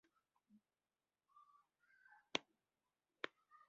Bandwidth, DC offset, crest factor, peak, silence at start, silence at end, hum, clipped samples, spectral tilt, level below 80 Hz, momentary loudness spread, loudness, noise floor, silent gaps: 6 kHz; under 0.1%; 38 dB; -20 dBFS; 2.35 s; 0.4 s; none; under 0.1%; 0.5 dB/octave; under -90 dBFS; 23 LU; -49 LUFS; under -90 dBFS; none